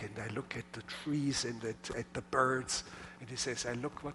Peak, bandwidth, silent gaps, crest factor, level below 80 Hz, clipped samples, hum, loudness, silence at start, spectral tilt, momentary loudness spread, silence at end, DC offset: -16 dBFS; 11.5 kHz; none; 22 dB; -62 dBFS; under 0.1%; none; -37 LUFS; 0 s; -3.5 dB/octave; 12 LU; 0 s; under 0.1%